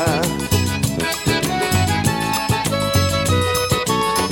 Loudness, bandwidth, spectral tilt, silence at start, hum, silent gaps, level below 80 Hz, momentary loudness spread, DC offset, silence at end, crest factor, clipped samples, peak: -18 LUFS; over 20 kHz; -4 dB/octave; 0 s; none; none; -36 dBFS; 3 LU; under 0.1%; 0 s; 16 dB; under 0.1%; -4 dBFS